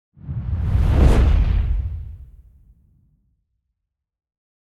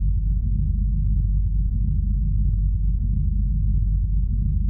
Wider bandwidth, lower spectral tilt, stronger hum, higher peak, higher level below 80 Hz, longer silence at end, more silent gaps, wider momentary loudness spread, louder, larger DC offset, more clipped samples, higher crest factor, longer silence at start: first, 10 kHz vs 0.5 kHz; second, -8 dB/octave vs -16 dB/octave; neither; first, -2 dBFS vs -12 dBFS; about the same, -22 dBFS vs -20 dBFS; first, 2.4 s vs 0 s; neither; first, 16 LU vs 1 LU; first, -20 LUFS vs -24 LUFS; neither; neither; first, 18 dB vs 8 dB; first, 0.25 s vs 0 s